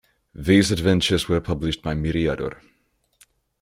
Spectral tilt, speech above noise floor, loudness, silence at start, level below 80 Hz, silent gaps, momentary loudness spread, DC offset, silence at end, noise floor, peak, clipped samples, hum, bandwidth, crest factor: -5.5 dB/octave; 40 dB; -22 LUFS; 0.4 s; -40 dBFS; none; 11 LU; under 0.1%; 1.05 s; -60 dBFS; -4 dBFS; under 0.1%; none; 16 kHz; 20 dB